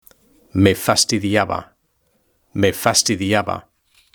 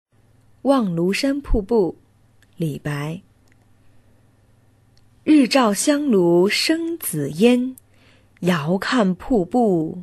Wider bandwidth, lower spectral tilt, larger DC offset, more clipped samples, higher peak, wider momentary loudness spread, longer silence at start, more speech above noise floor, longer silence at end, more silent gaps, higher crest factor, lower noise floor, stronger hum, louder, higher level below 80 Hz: first, over 20 kHz vs 12.5 kHz; second, -3.5 dB/octave vs -5 dB/octave; neither; neither; about the same, 0 dBFS vs -2 dBFS; about the same, 12 LU vs 11 LU; about the same, 0.55 s vs 0.65 s; first, 47 dB vs 37 dB; first, 0.55 s vs 0 s; neither; about the same, 20 dB vs 18 dB; first, -65 dBFS vs -55 dBFS; neither; about the same, -17 LUFS vs -19 LUFS; second, -50 dBFS vs -36 dBFS